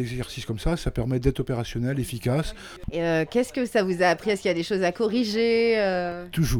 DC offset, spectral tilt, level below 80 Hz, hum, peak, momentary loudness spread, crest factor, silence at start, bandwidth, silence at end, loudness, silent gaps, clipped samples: under 0.1%; -6 dB/octave; -38 dBFS; none; -6 dBFS; 8 LU; 18 dB; 0 s; 19.5 kHz; 0 s; -25 LUFS; none; under 0.1%